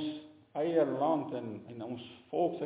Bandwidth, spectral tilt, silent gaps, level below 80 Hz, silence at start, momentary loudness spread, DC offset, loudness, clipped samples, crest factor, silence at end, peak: 4 kHz; -6 dB/octave; none; -76 dBFS; 0 s; 14 LU; under 0.1%; -34 LUFS; under 0.1%; 18 dB; 0 s; -16 dBFS